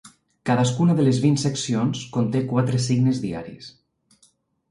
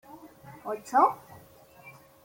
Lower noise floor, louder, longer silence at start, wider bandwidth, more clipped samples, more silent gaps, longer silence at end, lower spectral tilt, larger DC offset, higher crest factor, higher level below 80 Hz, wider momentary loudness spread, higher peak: first, -62 dBFS vs -54 dBFS; first, -22 LUFS vs -26 LUFS; about the same, 0.05 s vs 0.15 s; second, 11.5 kHz vs 16.5 kHz; neither; neither; first, 1 s vs 0.35 s; about the same, -6 dB/octave vs -5 dB/octave; neither; second, 16 dB vs 22 dB; first, -58 dBFS vs -72 dBFS; second, 13 LU vs 26 LU; about the same, -8 dBFS vs -10 dBFS